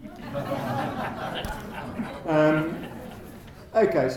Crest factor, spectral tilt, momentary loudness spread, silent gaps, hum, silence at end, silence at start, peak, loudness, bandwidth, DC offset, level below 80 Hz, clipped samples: 18 dB; -6.5 dB/octave; 19 LU; none; none; 0 s; 0 s; -10 dBFS; -27 LUFS; 18.5 kHz; under 0.1%; -48 dBFS; under 0.1%